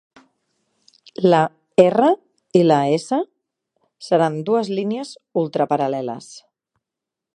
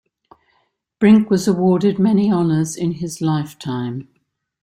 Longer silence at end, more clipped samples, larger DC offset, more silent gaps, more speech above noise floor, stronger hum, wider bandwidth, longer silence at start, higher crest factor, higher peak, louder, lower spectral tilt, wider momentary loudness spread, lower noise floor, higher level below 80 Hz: first, 1 s vs 0.6 s; neither; neither; neither; first, 67 dB vs 49 dB; neither; second, 11 kHz vs 15.5 kHz; first, 1.2 s vs 1 s; about the same, 20 dB vs 16 dB; about the same, 0 dBFS vs -2 dBFS; about the same, -19 LUFS vs -17 LUFS; about the same, -6.5 dB/octave vs -7 dB/octave; about the same, 14 LU vs 12 LU; first, -85 dBFS vs -65 dBFS; second, -70 dBFS vs -56 dBFS